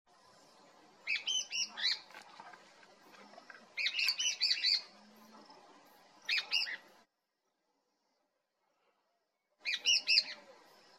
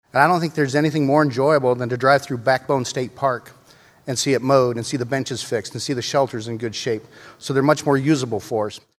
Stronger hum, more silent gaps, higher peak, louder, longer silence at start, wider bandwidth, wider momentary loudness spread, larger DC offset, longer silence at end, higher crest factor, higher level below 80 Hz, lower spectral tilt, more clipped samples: neither; neither; second, -14 dBFS vs 0 dBFS; second, -32 LUFS vs -20 LUFS; first, 1.05 s vs 0.15 s; first, 16 kHz vs 14.5 kHz; first, 23 LU vs 9 LU; neither; first, 0.45 s vs 0.2 s; first, 26 dB vs 20 dB; second, under -90 dBFS vs -62 dBFS; second, 3 dB/octave vs -5 dB/octave; neither